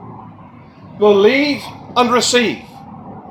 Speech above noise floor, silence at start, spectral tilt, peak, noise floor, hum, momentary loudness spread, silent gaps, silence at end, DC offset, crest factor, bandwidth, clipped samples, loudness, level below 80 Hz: 26 dB; 0 s; -3.5 dB/octave; 0 dBFS; -39 dBFS; none; 24 LU; none; 0 s; under 0.1%; 16 dB; 14.5 kHz; under 0.1%; -14 LUFS; -54 dBFS